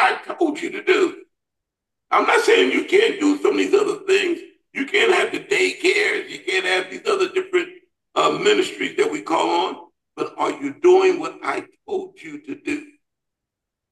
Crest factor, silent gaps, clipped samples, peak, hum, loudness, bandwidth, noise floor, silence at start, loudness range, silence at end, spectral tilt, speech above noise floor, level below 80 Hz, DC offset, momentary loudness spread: 16 dB; none; under 0.1%; -4 dBFS; none; -20 LUFS; 12.5 kHz; -83 dBFS; 0 s; 4 LU; 1.05 s; -2.5 dB/octave; 64 dB; -72 dBFS; under 0.1%; 13 LU